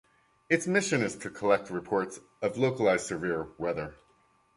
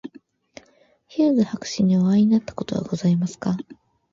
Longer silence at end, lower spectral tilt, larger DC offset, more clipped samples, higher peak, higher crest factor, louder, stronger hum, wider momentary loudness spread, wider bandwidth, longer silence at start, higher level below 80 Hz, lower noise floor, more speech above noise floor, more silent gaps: first, 0.65 s vs 0.4 s; second, -5 dB/octave vs -7 dB/octave; neither; neither; about the same, -8 dBFS vs -8 dBFS; first, 22 dB vs 14 dB; second, -30 LUFS vs -21 LUFS; neither; second, 8 LU vs 13 LU; first, 11.5 kHz vs 7.6 kHz; first, 0.5 s vs 0.05 s; about the same, -62 dBFS vs -58 dBFS; first, -67 dBFS vs -58 dBFS; about the same, 37 dB vs 38 dB; neither